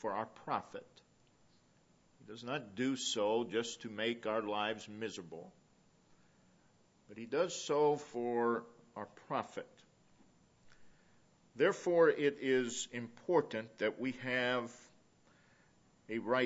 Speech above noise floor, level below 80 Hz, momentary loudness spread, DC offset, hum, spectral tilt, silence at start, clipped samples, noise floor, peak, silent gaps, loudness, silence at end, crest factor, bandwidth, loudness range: 33 dB; -80 dBFS; 17 LU; under 0.1%; none; -3 dB/octave; 0 s; under 0.1%; -70 dBFS; -18 dBFS; none; -36 LUFS; 0 s; 20 dB; 7.6 kHz; 8 LU